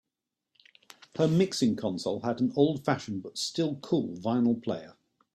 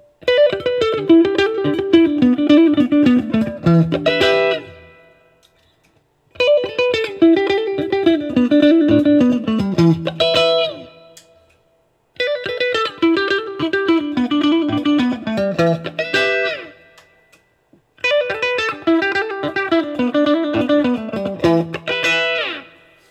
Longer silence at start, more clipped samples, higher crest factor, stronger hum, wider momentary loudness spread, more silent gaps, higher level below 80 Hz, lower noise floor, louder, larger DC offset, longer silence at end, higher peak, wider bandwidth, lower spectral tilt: first, 1.15 s vs 0.25 s; neither; about the same, 20 dB vs 16 dB; neither; about the same, 8 LU vs 8 LU; neither; second, -68 dBFS vs -54 dBFS; first, -87 dBFS vs -60 dBFS; second, -29 LUFS vs -16 LUFS; neither; about the same, 0.45 s vs 0.5 s; second, -10 dBFS vs 0 dBFS; first, 13.5 kHz vs 8.6 kHz; about the same, -6 dB/octave vs -6.5 dB/octave